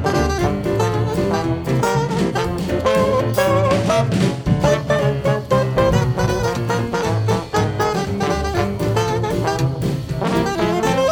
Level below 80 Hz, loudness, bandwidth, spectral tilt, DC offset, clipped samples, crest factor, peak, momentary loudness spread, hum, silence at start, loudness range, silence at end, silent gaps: -34 dBFS; -19 LUFS; over 20 kHz; -6 dB/octave; under 0.1%; under 0.1%; 14 dB; -4 dBFS; 4 LU; none; 0 s; 3 LU; 0 s; none